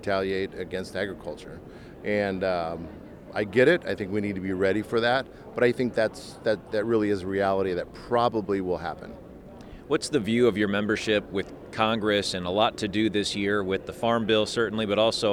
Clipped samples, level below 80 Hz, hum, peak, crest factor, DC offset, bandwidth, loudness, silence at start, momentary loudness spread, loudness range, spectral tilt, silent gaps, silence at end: under 0.1%; -54 dBFS; none; -6 dBFS; 20 dB; under 0.1%; 14.5 kHz; -26 LUFS; 0 s; 15 LU; 3 LU; -5 dB/octave; none; 0 s